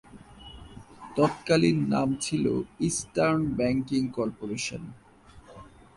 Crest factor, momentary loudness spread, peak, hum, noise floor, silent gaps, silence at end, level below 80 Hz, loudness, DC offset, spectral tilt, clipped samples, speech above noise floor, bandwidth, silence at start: 18 dB; 23 LU; -10 dBFS; none; -52 dBFS; none; 0.3 s; -54 dBFS; -27 LUFS; under 0.1%; -5.5 dB/octave; under 0.1%; 25 dB; 11.5 kHz; 0.15 s